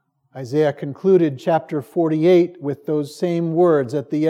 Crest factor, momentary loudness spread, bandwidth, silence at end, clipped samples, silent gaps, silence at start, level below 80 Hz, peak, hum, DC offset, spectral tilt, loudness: 14 dB; 9 LU; 12 kHz; 0 s; under 0.1%; none; 0.35 s; -80 dBFS; -4 dBFS; none; under 0.1%; -8 dB/octave; -19 LUFS